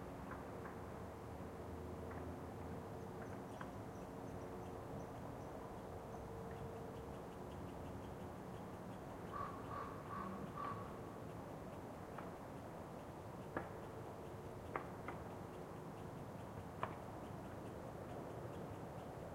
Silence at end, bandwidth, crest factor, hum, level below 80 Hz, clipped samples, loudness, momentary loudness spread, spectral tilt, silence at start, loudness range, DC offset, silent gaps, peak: 0 s; 16 kHz; 26 dB; none; -64 dBFS; under 0.1%; -51 LUFS; 4 LU; -7 dB/octave; 0 s; 2 LU; under 0.1%; none; -24 dBFS